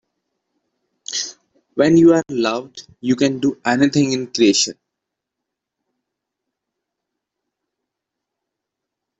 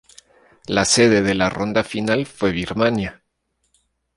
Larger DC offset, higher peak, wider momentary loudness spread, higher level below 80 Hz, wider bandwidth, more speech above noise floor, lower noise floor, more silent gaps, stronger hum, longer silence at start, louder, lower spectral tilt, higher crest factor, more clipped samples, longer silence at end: neither; about the same, -2 dBFS vs -2 dBFS; first, 16 LU vs 10 LU; second, -60 dBFS vs -46 dBFS; second, 8 kHz vs 11.5 kHz; first, 66 dB vs 52 dB; first, -82 dBFS vs -71 dBFS; neither; neither; first, 1.1 s vs 0.7 s; about the same, -17 LUFS vs -19 LUFS; about the same, -4.5 dB/octave vs -4 dB/octave; about the same, 18 dB vs 20 dB; neither; first, 4.5 s vs 1.05 s